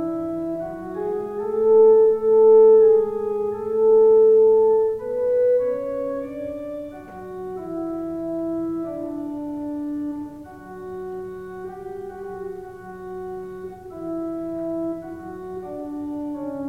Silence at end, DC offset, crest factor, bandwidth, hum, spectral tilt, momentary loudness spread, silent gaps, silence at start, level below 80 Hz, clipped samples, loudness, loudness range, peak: 0 s; under 0.1%; 14 dB; 2.5 kHz; none; -9 dB/octave; 21 LU; none; 0 s; -56 dBFS; under 0.1%; -20 LUFS; 17 LU; -6 dBFS